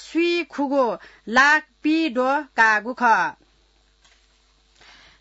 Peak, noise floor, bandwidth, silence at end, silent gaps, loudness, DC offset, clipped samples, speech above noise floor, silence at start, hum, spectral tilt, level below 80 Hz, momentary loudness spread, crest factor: -4 dBFS; -60 dBFS; 8 kHz; 1.9 s; none; -20 LUFS; under 0.1%; under 0.1%; 40 dB; 0 s; none; -3 dB/octave; -62 dBFS; 7 LU; 18 dB